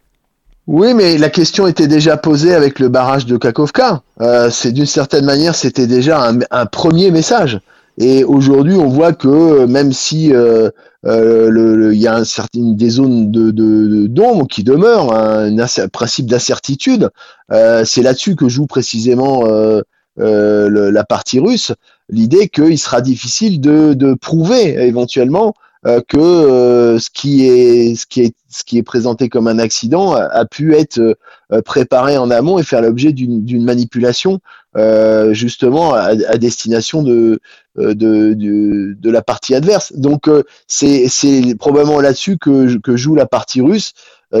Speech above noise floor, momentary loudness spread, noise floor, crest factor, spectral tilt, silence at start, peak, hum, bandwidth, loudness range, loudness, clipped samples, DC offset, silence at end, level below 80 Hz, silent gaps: 45 dB; 7 LU; -55 dBFS; 10 dB; -5.5 dB/octave; 0.65 s; 0 dBFS; none; 8.2 kHz; 3 LU; -11 LUFS; under 0.1%; under 0.1%; 0 s; -48 dBFS; none